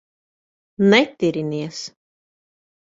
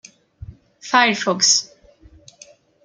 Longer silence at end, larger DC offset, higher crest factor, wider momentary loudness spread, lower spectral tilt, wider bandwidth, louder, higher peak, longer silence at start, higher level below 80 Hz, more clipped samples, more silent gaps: second, 1.05 s vs 1.2 s; neither; about the same, 22 dB vs 20 dB; second, 17 LU vs 22 LU; first, -5.5 dB/octave vs -1 dB/octave; second, 7.8 kHz vs 11 kHz; about the same, -18 LUFS vs -16 LUFS; about the same, -2 dBFS vs -2 dBFS; first, 0.8 s vs 0.5 s; second, -64 dBFS vs -52 dBFS; neither; neither